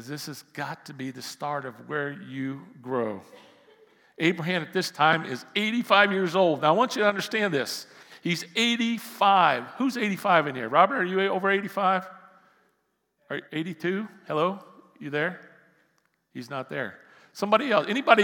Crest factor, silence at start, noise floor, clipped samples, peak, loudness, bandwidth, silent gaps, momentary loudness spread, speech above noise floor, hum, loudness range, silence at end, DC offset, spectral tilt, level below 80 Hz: 26 dB; 0 s; -74 dBFS; under 0.1%; -2 dBFS; -26 LUFS; 18 kHz; none; 15 LU; 49 dB; none; 10 LU; 0 s; under 0.1%; -4.5 dB/octave; -86 dBFS